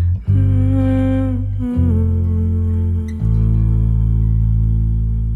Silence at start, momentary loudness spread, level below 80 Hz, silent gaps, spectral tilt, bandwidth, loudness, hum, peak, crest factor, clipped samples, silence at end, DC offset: 0 s; 4 LU; -20 dBFS; none; -11 dB/octave; 3.4 kHz; -17 LUFS; none; -4 dBFS; 10 dB; under 0.1%; 0 s; under 0.1%